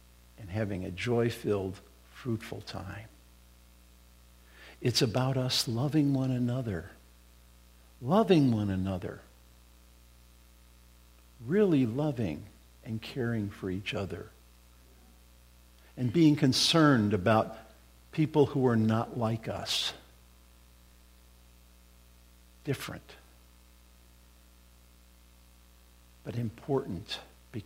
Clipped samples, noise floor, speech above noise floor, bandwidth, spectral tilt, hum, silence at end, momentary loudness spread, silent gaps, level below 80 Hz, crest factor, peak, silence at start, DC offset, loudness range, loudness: under 0.1%; -58 dBFS; 29 dB; 16 kHz; -5.5 dB/octave; 60 Hz at -55 dBFS; 0 s; 19 LU; none; -58 dBFS; 22 dB; -10 dBFS; 0.4 s; under 0.1%; 17 LU; -30 LUFS